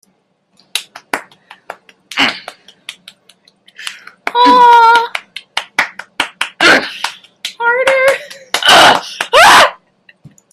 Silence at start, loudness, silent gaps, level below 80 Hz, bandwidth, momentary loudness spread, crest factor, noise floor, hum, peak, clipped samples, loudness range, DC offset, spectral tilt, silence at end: 0.75 s; -10 LUFS; none; -52 dBFS; 16.5 kHz; 22 LU; 12 dB; -59 dBFS; none; 0 dBFS; 0.3%; 12 LU; under 0.1%; -1 dB/octave; 0.8 s